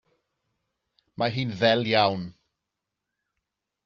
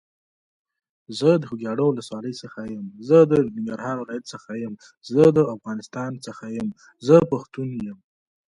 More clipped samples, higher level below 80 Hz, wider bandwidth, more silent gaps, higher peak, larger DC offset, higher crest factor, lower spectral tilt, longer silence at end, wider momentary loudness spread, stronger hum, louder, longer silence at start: neither; second, -68 dBFS vs -62 dBFS; second, 7.2 kHz vs 11 kHz; neither; second, -6 dBFS vs -2 dBFS; neither; about the same, 24 dB vs 22 dB; second, -3 dB/octave vs -7.5 dB/octave; first, 1.55 s vs 0.55 s; second, 12 LU vs 17 LU; neither; about the same, -24 LUFS vs -22 LUFS; about the same, 1.2 s vs 1.1 s